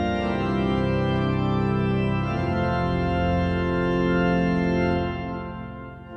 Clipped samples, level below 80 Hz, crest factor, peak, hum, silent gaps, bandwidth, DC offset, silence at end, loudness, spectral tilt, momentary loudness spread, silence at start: under 0.1%; -38 dBFS; 12 dB; -10 dBFS; none; none; 6.6 kHz; under 0.1%; 0 s; -24 LUFS; -8.5 dB/octave; 9 LU; 0 s